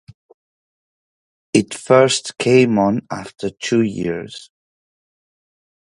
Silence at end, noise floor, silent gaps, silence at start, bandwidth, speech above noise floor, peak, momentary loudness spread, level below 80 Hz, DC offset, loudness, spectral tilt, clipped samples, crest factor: 1.45 s; under -90 dBFS; none; 1.55 s; 11.5 kHz; over 73 dB; 0 dBFS; 15 LU; -56 dBFS; under 0.1%; -17 LUFS; -5 dB/octave; under 0.1%; 20 dB